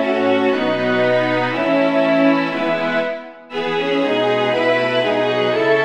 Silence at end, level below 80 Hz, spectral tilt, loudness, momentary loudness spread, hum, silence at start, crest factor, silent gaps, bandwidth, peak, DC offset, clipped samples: 0 s; -60 dBFS; -6 dB/octave; -17 LUFS; 5 LU; none; 0 s; 14 dB; none; 9.2 kHz; -4 dBFS; under 0.1%; under 0.1%